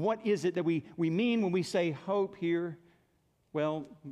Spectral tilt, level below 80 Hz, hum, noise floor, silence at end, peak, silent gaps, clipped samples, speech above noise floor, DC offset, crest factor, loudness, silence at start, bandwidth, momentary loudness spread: -6.5 dB/octave; -76 dBFS; none; -72 dBFS; 0 s; -18 dBFS; none; under 0.1%; 41 dB; under 0.1%; 14 dB; -32 LUFS; 0 s; 12 kHz; 9 LU